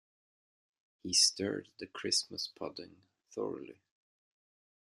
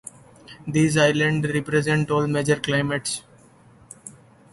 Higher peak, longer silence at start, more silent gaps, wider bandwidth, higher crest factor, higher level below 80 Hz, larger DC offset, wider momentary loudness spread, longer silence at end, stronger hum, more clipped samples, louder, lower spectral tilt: second, -14 dBFS vs -6 dBFS; first, 1.05 s vs 0.5 s; neither; first, 14.5 kHz vs 11.5 kHz; first, 24 dB vs 18 dB; second, -80 dBFS vs -54 dBFS; neither; about the same, 22 LU vs 23 LU; first, 1.2 s vs 0.4 s; neither; neither; second, -32 LUFS vs -22 LUFS; second, -1.5 dB/octave vs -5 dB/octave